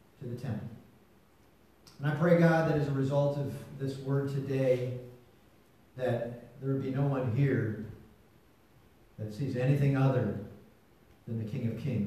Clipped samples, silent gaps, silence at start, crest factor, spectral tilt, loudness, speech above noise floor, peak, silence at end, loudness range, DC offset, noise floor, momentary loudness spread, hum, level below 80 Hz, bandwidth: under 0.1%; none; 0.2 s; 20 dB; -8.5 dB/octave; -31 LUFS; 33 dB; -12 dBFS; 0 s; 5 LU; under 0.1%; -63 dBFS; 16 LU; none; -64 dBFS; 13.5 kHz